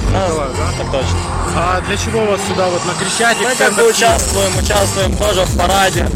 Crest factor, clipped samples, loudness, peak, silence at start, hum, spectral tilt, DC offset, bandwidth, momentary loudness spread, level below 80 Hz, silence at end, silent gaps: 12 dB; under 0.1%; -14 LUFS; -2 dBFS; 0 s; none; -3.5 dB/octave; under 0.1%; 16.5 kHz; 7 LU; -24 dBFS; 0 s; none